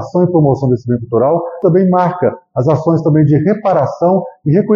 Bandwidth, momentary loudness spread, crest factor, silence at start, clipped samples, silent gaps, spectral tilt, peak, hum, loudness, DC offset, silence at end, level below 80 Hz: 7 kHz; 5 LU; 12 dB; 0 s; under 0.1%; none; -10 dB/octave; 0 dBFS; none; -13 LUFS; under 0.1%; 0 s; -48 dBFS